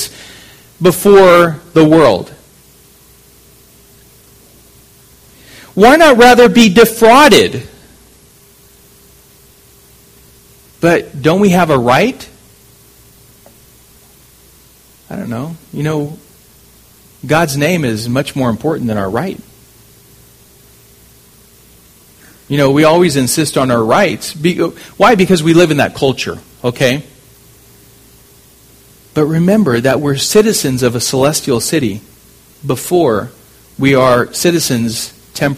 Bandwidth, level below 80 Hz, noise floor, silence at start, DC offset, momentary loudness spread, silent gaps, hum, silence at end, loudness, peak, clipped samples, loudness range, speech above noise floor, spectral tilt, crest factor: 16 kHz; -42 dBFS; -44 dBFS; 0 s; under 0.1%; 16 LU; none; none; 0 s; -11 LUFS; 0 dBFS; 0.5%; 15 LU; 34 dB; -5 dB/octave; 14 dB